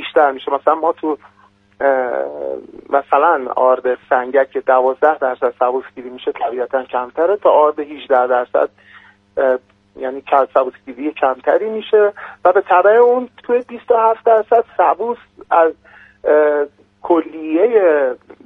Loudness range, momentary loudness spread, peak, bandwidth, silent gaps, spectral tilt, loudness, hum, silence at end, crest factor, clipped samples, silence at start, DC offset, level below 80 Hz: 4 LU; 12 LU; 0 dBFS; 4 kHz; none; -6.5 dB/octave; -16 LUFS; none; 0.3 s; 16 dB; under 0.1%; 0 s; under 0.1%; -62 dBFS